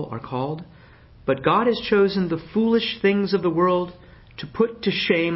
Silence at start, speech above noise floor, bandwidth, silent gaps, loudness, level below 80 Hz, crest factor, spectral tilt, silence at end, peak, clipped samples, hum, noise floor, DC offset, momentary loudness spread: 0 s; 27 dB; 5.8 kHz; none; -22 LUFS; -52 dBFS; 18 dB; -10 dB/octave; 0 s; -6 dBFS; under 0.1%; none; -48 dBFS; under 0.1%; 13 LU